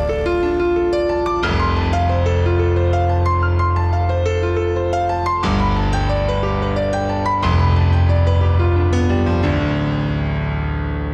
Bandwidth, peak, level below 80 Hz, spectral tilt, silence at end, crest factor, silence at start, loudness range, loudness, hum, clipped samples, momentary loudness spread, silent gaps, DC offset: 8 kHz; -4 dBFS; -26 dBFS; -7.5 dB/octave; 0 s; 12 dB; 0 s; 2 LU; -18 LUFS; none; under 0.1%; 4 LU; none; under 0.1%